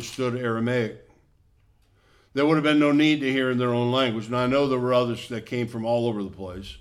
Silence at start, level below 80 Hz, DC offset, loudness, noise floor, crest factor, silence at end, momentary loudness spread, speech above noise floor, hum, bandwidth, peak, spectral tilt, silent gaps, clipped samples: 0 s; -56 dBFS; under 0.1%; -24 LUFS; -61 dBFS; 16 dB; 0 s; 13 LU; 37 dB; none; 13 kHz; -8 dBFS; -6 dB/octave; none; under 0.1%